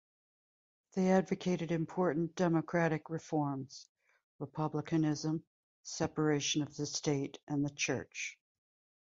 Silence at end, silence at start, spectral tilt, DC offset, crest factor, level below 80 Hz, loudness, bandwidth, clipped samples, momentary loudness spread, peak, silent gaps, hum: 0.7 s; 0.95 s; -5 dB/octave; under 0.1%; 20 dB; -70 dBFS; -35 LUFS; 7.8 kHz; under 0.1%; 11 LU; -16 dBFS; 3.89-3.95 s, 4.24-4.39 s, 5.47-5.84 s, 7.43-7.47 s; none